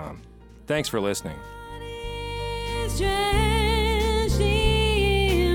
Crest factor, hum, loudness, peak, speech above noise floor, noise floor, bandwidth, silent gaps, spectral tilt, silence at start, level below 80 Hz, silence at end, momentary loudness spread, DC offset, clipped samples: 16 dB; none; -24 LUFS; -8 dBFS; 22 dB; -46 dBFS; 17 kHz; none; -5 dB/octave; 0 s; -28 dBFS; 0 s; 16 LU; under 0.1%; under 0.1%